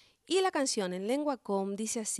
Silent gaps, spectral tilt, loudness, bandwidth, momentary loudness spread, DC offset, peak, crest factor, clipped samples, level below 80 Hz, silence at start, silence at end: none; -3 dB/octave; -32 LUFS; 13 kHz; 5 LU; under 0.1%; -18 dBFS; 14 dB; under 0.1%; -78 dBFS; 0.3 s; 0 s